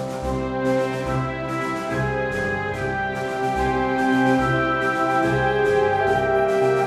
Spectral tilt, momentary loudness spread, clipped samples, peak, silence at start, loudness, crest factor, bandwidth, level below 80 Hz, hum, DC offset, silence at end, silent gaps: -6.5 dB/octave; 6 LU; under 0.1%; -8 dBFS; 0 s; -22 LUFS; 14 dB; 14 kHz; -40 dBFS; none; under 0.1%; 0 s; none